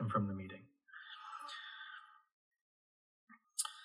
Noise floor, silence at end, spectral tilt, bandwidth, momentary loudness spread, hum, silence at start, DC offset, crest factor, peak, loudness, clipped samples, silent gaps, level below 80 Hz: under -90 dBFS; 0 s; -4 dB/octave; 14 kHz; 18 LU; none; 0 s; under 0.1%; 24 dB; -20 dBFS; -45 LUFS; under 0.1%; 2.32-2.51 s, 2.61-3.27 s; -82 dBFS